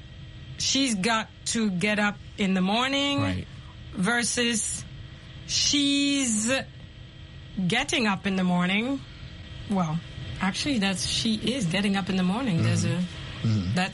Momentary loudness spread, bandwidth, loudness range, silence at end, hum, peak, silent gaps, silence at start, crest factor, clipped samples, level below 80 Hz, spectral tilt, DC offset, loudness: 19 LU; 11.5 kHz; 2 LU; 0 s; none; -10 dBFS; none; 0 s; 16 dB; under 0.1%; -48 dBFS; -4 dB/octave; under 0.1%; -25 LUFS